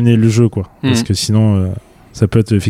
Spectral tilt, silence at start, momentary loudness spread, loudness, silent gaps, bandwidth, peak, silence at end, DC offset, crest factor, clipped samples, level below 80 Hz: -6.5 dB/octave; 0 s; 8 LU; -14 LUFS; none; 14.5 kHz; 0 dBFS; 0 s; under 0.1%; 12 dB; under 0.1%; -40 dBFS